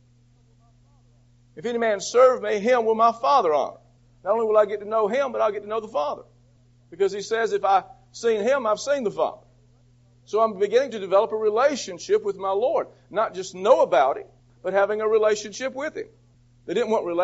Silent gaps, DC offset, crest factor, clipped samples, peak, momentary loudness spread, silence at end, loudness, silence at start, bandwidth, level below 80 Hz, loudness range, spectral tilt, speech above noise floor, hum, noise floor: none; under 0.1%; 18 dB; under 0.1%; -4 dBFS; 12 LU; 0 s; -23 LUFS; 1.55 s; 8 kHz; -64 dBFS; 4 LU; -2.5 dB/octave; 35 dB; none; -57 dBFS